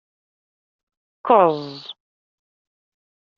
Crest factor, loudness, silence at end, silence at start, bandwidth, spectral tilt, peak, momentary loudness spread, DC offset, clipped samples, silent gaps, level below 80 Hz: 22 dB; -17 LUFS; 1.45 s; 1.25 s; 6.8 kHz; -4 dB/octave; -2 dBFS; 21 LU; under 0.1%; under 0.1%; none; -72 dBFS